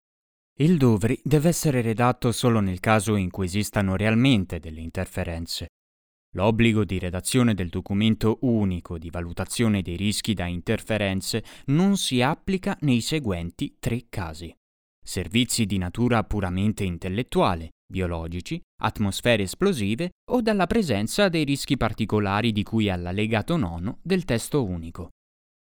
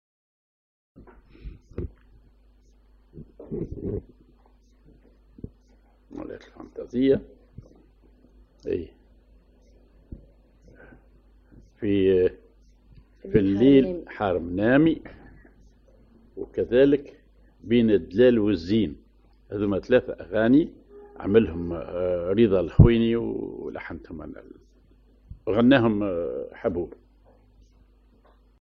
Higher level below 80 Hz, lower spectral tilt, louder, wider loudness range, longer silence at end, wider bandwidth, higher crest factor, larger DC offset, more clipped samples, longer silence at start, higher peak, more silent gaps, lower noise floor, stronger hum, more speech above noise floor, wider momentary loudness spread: about the same, -44 dBFS vs -42 dBFS; second, -5.5 dB/octave vs -9.5 dB/octave; about the same, -24 LUFS vs -23 LUFS; second, 4 LU vs 17 LU; second, 0.5 s vs 1.75 s; first, over 20 kHz vs 6.2 kHz; second, 20 dB vs 26 dB; neither; neither; second, 0.6 s vs 1 s; second, -4 dBFS vs 0 dBFS; first, 5.69-6.33 s, 14.57-15.02 s, 17.72-17.89 s, 18.63-18.78 s, 20.12-20.27 s vs none; first, under -90 dBFS vs -57 dBFS; neither; first, over 66 dB vs 35 dB; second, 11 LU vs 22 LU